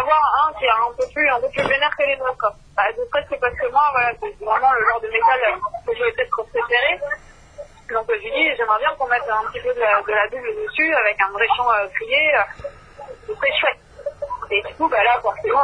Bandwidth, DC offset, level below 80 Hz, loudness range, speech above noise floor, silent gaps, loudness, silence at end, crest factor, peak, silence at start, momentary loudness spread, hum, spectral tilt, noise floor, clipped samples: 10.5 kHz; under 0.1%; -48 dBFS; 2 LU; 21 dB; none; -19 LUFS; 0 s; 16 dB; -4 dBFS; 0 s; 10 LU; none; -4 dB/octave; -40 dBFS; under 0.1%